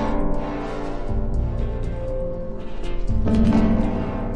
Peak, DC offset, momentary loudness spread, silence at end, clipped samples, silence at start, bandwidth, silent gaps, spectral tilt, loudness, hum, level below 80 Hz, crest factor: -6 dBFS; under 0.1%; 13 LU; 0 s; under 0.1%; 0 s; 8.2 kHz; none; -8.5 dB/octave; -25 LUFS; none; -26 dBFS; 16 dB